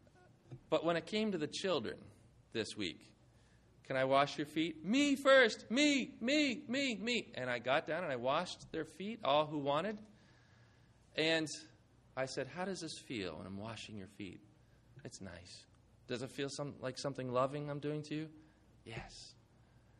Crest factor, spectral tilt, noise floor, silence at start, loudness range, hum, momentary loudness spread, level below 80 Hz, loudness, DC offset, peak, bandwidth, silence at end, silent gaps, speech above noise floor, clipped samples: 22 dB; -4 dB/octave; -66 dBFS; 0.5 s; 13 LU; none; 18 LU; -72 dBFS; -37 LUFS; under 0.1%; -16 dBFS; 12.5 kHz; 0.7 s; none; 29 dB; under 0.1%